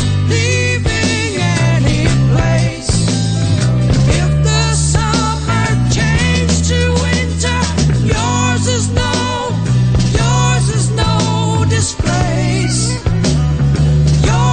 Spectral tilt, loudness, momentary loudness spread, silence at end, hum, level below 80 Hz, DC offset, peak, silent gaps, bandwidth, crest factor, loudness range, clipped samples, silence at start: -5 dB/octave; -13 LUFS; 3 LU; 0 s; none; -22 dBFS; 0.6%; -2 dBFS; none; 9.4 kHz; 10 dB; 1 LU; under 0.1%; 0 s